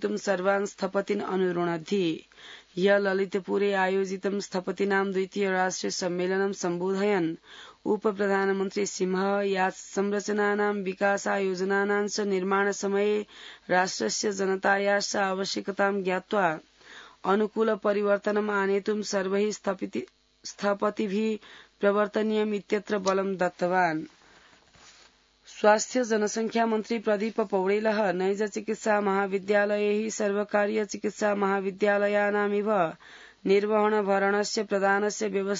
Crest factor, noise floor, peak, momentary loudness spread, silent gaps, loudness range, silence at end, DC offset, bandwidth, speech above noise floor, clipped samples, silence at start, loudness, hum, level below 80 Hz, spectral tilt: 20 dB; -59 dBFS; -8 dBFS; 7 LU; none; 2 LU; 0 s; under 0.1%; 7.8 kHz; 33 dB; under 0.1%; 0 s; -27 LUFS; none; -72 dBFS; -4.5 dB/octave